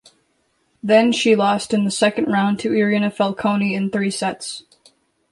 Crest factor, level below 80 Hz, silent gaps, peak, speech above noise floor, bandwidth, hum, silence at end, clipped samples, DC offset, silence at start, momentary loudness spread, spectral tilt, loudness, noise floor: 16 dB; -62 dBFS; none; -4 dBFS; 47 dB; 11.5 kHz; none; 0.7 s; under 0.1%; under 0.1%; 0.85 s; 9 LU; -5 dB/octave; -18 LUFS; -65 dBFS